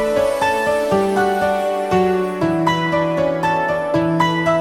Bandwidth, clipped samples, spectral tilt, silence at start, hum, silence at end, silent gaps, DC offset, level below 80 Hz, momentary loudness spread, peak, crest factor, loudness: 16 kHz; under 0.1%; -6 dB/octave; 0 s; none; 0 s; none; under 0.1%; -46 dBFS; 2 LU; -2 dBFS; 14 dB; -17 LUFS